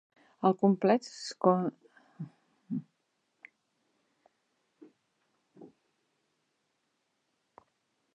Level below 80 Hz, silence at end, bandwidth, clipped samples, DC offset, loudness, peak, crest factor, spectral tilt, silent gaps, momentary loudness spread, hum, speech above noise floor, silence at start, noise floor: -90 dBFS; 2.5 s; 9.6 kHz; under 0.1%; under 0.1%; -30 LUFS; -10 dBFS; 24 dB; -7 dB/octave; none; 21 LU; none; 52 dB; 0.4 s; -79 dBFS